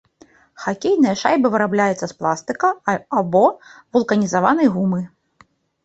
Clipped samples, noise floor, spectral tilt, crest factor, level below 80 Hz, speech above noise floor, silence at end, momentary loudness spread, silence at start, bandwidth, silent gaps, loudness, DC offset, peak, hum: under 0.1%; -55 dBFS; -6 dB/octave; 18 dB; -60 dBFS; 37 dB; 0.75 s; 8 LU; 0.6 s; 8.2 kHz; none; -18 LUFS; under 0.1%; -2 dBFS; none